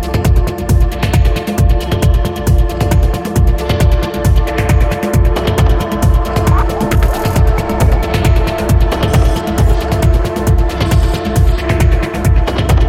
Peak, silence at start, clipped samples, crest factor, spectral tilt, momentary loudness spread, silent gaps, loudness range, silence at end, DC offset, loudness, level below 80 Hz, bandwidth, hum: 0 dBFS; 0 s; under 0.1%; 10 dB; -6.5 dB/octave; 2 LU; none; 0 LU; 0 s; under 0.1%; -13 LUFS; -14 dBFS; 16 kHz; none